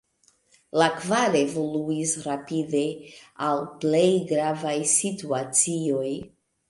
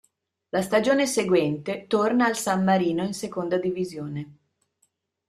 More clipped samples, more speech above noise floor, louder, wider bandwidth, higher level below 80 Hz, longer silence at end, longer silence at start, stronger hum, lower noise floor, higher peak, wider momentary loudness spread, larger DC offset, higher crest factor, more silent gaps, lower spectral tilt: neither; second, 40 dB vs 48 dB; about the same, -24 LUFS vs -24 LUFS; second, 11.5 kHz vs 15 kHz; about the same, -68 dBFS vs -66 dBFS; second, 0.4 s vs 0.95 s; first, 0.75 s vs 0.55 s; neither; second, -64 dBFS vs -71 dBFS; about the same, -6 dBFS vs -8 dBFS; about the same, 8 LU vs 10 LU; neither; about the same, 20 dB vs 18 dB; neither; second, -3.5 dB/octave vs -5 dB/octave